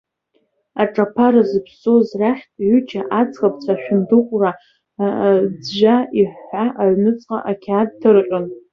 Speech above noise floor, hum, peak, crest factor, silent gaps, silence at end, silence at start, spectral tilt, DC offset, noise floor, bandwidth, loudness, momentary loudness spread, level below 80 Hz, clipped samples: 49 dB; none; -2 dBFS; 14 dB; none; 0.15 s; 0.75 s; -8 dB/octave; under 0.1%; -65 dBFS; 6.4 kHz; -17 LUFS; 8 LU; -60 dBFS; under 0.1%